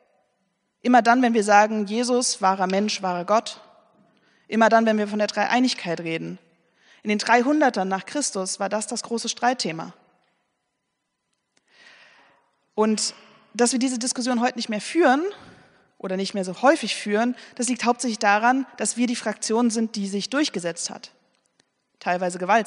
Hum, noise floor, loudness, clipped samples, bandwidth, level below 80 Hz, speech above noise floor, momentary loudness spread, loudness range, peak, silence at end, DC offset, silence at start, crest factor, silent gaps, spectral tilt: none; -78 dBFS; -22 LUFS; under 0.1%; 10.5 kHz; -78 dBFS; 55 dB; 11 LU; 8 LU; -2 dBFS; 0 s; under 0.1%; 0.85 s; 22 dB; none; -3.5 dB/octave